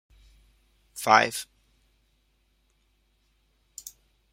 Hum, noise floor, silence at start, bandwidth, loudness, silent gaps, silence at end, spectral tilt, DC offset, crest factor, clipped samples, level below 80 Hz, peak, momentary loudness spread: none; -69 dBFS; 0.95 s; 16 kHz; -23 LUFS; none; 0.45 s; -2 dB/octave; under 0.1%; 30 dB; under 0.1%; -64 dBFS; -2 dBFS; 25 LU